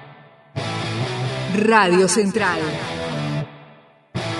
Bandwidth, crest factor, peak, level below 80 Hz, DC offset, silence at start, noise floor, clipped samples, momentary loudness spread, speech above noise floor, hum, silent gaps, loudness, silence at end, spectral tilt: 11.5 kHz; 20 dB; -2 dBFS; -54 dBFS; under 0.1%; 0 s; -49 dBFS; under 0.1%; 14 LU; 32 dB; none; none; -20 LUFS; 0 s; -4.5 dB/octave